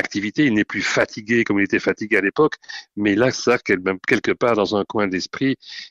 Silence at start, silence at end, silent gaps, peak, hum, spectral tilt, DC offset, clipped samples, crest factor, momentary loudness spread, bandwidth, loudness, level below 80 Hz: 0 s; 0.05 s; none; -4 dBFS; none; -5 dB/octave; under 0.1%; under 0.1%; 16 dB; 5 LU; 8.8 kHz; -20 LUFS; -56 dBFS